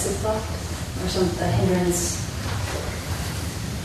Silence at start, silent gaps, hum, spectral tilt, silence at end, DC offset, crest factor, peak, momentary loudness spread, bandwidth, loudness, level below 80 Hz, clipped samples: 0 s; none; none; -4.5 dB/octave; 0 s; under 0.1%; 16 dB; -8 dBFS; 8 LU; 13.5 kHz; -25 LUFS; -36 dBFS; under 0.1%